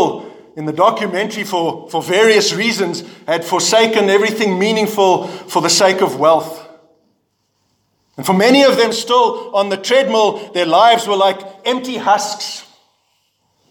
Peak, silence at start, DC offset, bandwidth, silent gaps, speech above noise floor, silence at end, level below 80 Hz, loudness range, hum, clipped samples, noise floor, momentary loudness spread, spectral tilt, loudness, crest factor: 0 dBFS; 0 s; under 0.1%; 19 kHz; none; 51 dB; 1.1 s; -68 dBFS; 3 LU; none; under 0.1%; -65 dBFS; 12 LU; -3 dB/octave; -14 LUFS; 14 dB